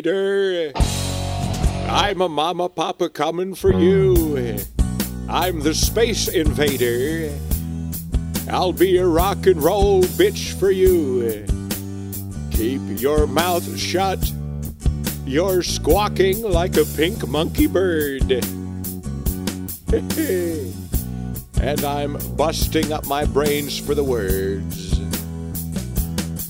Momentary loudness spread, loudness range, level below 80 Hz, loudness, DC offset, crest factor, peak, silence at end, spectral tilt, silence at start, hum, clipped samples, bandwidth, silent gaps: 10 LU; 4 LU; -28 dBFS; -20 LUFS; under 0.1%; 18 dB; -2 dBFS; 0 s; -5 dB/octave; 0 s; none; under 0.1%; 16.5 kHz; none